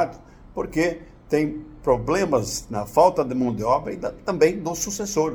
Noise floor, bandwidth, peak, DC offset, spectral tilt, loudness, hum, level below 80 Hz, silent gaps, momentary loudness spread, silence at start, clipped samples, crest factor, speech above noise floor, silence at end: -43 dBFS; over 20 kHz; -4 dBFS; under 0.1%; -5 dB/octave; -23 LUFS; none; -46 dBFS; none; 10 LU; 0 s; under 0.1%; 20 dB; 20 dB; 0 s